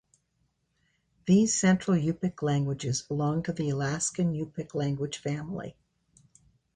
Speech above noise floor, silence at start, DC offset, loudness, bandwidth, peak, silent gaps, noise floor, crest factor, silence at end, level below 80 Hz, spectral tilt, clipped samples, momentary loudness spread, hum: 47 dB; 1.25 s; under 0.1%; -28 LUFS; 10 kHz; -12 dBFS; none; -74 dBFS; 18 dB; 1.05 s; -60 dBFS; -5.5 dB/octave; under 0.1%; 11 LU; none